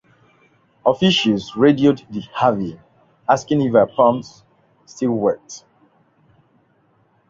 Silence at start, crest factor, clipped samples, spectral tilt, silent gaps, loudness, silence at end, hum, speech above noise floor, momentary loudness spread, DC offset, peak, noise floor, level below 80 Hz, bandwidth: 0.85 s; 20 dB; under 0.1%; -6 dB/octave; none; -18 LUFS; 1.7 s; none; 42 dB; 14 LU; under 0.1%; 0 dBFS; -60 dBFS; -58 dBFS; 7.6 kHz